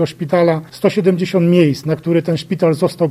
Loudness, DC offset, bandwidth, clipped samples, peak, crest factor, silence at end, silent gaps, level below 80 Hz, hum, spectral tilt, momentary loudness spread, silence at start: -15 LUFS; under 0.1%; 14 kHz; under 0.1%; 0 dBFS; 14 dB; 0 s; none; -56 dBFS; none; -7.5 dB/octave; 5 LU; 0 s